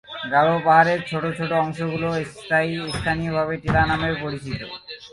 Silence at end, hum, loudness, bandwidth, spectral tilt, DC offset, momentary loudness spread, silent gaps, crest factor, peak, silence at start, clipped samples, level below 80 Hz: 0.05 s; none; -22 LUFS; 11.5 kHz; -6 dB/octave; under 0.1%; 13 LU; none; 20 dB; -2 dBFS; 0.1 s; under 0.1%; -42 dBFS